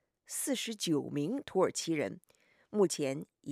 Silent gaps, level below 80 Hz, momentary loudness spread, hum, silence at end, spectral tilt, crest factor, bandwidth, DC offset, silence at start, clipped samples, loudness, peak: none; -78 dBFS; 9 LU; none; 0 s; -4 dB/octave; 18 dB; 15.5 kHz; under 0.1%; 0.3 s; under 0.1%; -34 LUFS; -16 dBFS